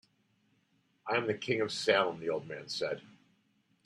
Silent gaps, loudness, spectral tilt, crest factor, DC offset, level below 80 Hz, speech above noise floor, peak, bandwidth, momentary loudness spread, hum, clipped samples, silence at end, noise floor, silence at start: none; -33 LUFS; -4 dB/octave; 22 dB; under 0.1%; -78 dBFS; 41 dB; -14 dBFS; 12.5 kHz; 11 LU; none; under 0.1%; 0.75 s; -73 dBFS; 1.05 s